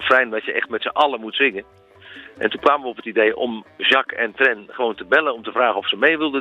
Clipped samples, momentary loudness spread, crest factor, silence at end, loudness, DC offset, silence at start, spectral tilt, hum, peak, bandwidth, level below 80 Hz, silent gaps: under 0.1%; 8 LU; 18 dB; 0 s; -19 LUFS; under 0.1%; 0 s; -4.5 dB/octave; none; -2 dBFS; 9.6 kHz; -64 dBFS; none